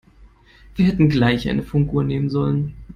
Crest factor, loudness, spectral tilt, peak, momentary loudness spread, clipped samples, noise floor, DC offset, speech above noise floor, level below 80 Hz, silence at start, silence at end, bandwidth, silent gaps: 16 dB; -19 LUFS; -8.5 dB/octave; -4 dBFS; 6 LU; under 0.1%; -49 dBFS; under 0.1%; 31 dB; -40 dBFS; 0.2 s; 0 s; 7 kHz; none